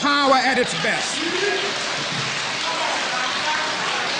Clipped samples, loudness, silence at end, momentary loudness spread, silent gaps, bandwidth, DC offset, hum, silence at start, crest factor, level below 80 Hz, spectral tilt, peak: under 0.1%; -20 LUFS; 0 s; 6 LU; none; 10.5 kHz; under 0.1%; none; 0 s; 16 dB; -60 dBFS; -2 dB/octave; -6 dBFS